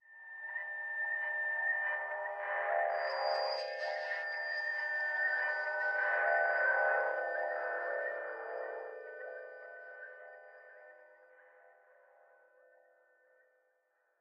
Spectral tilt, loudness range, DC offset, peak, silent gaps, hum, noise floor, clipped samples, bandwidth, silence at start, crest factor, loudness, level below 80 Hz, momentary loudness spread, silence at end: 1 dB/octave; 18 LU; under 0.1%; -20 dBFS; none; none; -77 dBFS; under 0.1%; 8.4 kHz; 0.1 s; 18 dB; -35 LUFS; under -90 dBFS; 19 LU; 2.5 s